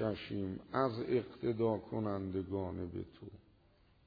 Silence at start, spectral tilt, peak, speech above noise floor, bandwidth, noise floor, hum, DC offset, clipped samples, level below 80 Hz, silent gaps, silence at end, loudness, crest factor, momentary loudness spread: 0 s; -6.5 dB/octave; -20 dBFS; 30 dB; 5 kHz; -68 dBFS; none; under 0.1%; under 0.1%; -66 dBFS; none; 0.65 s; -38 LUFS; 18 dB; 11 LU